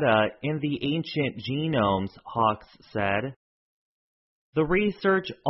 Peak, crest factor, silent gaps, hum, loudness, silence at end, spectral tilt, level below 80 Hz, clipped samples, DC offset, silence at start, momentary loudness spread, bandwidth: -8 dBFS; 18 dB; 3.36-4.53 s; none; -27 LUFS; 0 s; -10 dB/octave; -54 dBFS; under 0.1%; under 0.1%; 0 s; 8 LU; 5.8 kHz